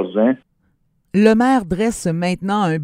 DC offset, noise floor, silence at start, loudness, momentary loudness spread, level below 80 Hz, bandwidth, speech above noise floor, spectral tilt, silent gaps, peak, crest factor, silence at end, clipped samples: under 0.1%; -63 dBFS; 0 s; -17 LUFS; 8 LU; -44 dBFS; 15 kHz; 47 dB; -6.5 dB/octave; none; 0 dBFS; 18 dB; 0 s; under 0.1%